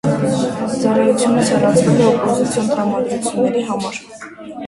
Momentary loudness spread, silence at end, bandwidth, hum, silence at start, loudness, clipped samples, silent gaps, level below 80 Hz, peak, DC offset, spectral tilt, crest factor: 12 LU; 0 s; 11.5 kHz; none; 0.05 s; -16 LUFS; under 0.1%; none; -50 dBFS; 0 dBFS; under 0.1%; -5.5 dB/octave; 14 dB